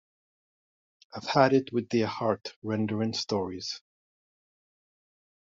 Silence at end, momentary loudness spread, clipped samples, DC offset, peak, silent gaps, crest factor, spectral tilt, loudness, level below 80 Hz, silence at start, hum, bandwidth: 1.8 s; 14 LU; under 0.1%; under 0.1%; -8 dBFS; 2.56-2.62 s; 24 dB; -4.5 dB/octave; -28 LUFS; -72 dBFS; 1.15 s; none; 7.8 kHz